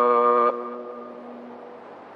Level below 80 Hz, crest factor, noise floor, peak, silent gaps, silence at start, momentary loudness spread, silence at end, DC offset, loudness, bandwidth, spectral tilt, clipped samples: -88 dBFS; 16 dB; -42 dBFS; -8 dBFS; none; 0 s; 23 LU; 0 s; under 0.1%; -21 LUFS; 4.7 kHz; -7 dB/octave; under 0.1%